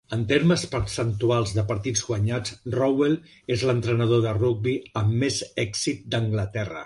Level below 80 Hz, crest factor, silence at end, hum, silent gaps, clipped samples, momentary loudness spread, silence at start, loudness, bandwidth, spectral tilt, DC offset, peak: -46 dBFS; 16 dB; 0 s; none; none; under 0.1%; 6 LU; 0.1 s; -24 LUFS; 11.5 kHz; -5.5 dB/octave; under 0.1%; -8 dBFS